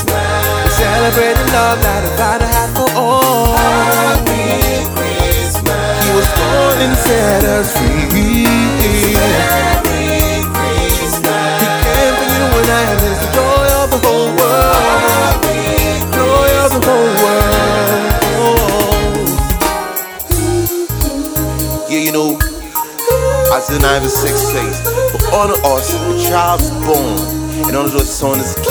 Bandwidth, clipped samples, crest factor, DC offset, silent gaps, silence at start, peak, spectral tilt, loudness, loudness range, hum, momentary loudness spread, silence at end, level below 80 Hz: over 20 kHz; under 0.1%; 12 dB; under 0.1%; none; 0 s; 0 dBFS; -4 dB/octave; -12 LUFS; 3 LU; none; 5 LU; 0 s; -22 dBFS